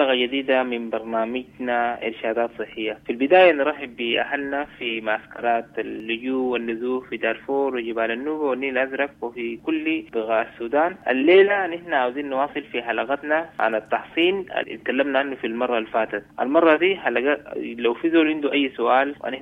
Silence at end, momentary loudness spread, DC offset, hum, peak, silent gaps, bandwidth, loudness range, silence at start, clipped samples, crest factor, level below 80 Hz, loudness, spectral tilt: 0 s; 10 LU; under 0.1%; none; -4 dBFS; none; 4.8 kHz; 4 LU; 0 s; under 0.1%; 18 dB; -62 dBFS; -22 LUFS; -6.5 dB/octave